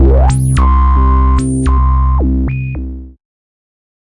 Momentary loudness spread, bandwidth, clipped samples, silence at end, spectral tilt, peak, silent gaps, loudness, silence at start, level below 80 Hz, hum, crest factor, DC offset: 11 LU; 11.5 kHz; under 0.1%; 0.95 s; -7.5 dB/octave; -2 dBFS; none; -12 LUFS; 0 s; -12 dBFS; none; 8 dB; under 0.1%